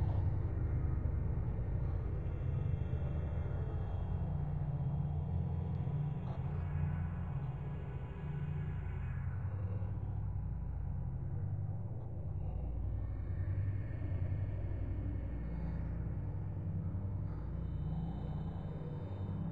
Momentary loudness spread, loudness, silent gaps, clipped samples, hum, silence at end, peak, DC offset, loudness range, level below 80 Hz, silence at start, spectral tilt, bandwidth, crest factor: 5 LU; -40 LUFS; none; under 0.1%; none; 0 s; -24 dBFS; 0.3%; 3 LU; -44 dBFS; 0 s; -11 dB/octave; 3.9 kHz; 14 dB